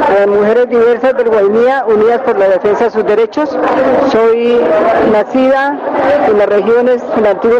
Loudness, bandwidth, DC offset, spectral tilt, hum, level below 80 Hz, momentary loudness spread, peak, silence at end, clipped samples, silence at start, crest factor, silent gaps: -10 LUFS; 7.2 kHz; under 0.1%; -6.5 dB/octave; none; -46 dBFS; 3 LU; -4 dBFS; 0 s; under 0.1%; 0 s; 6 dB; none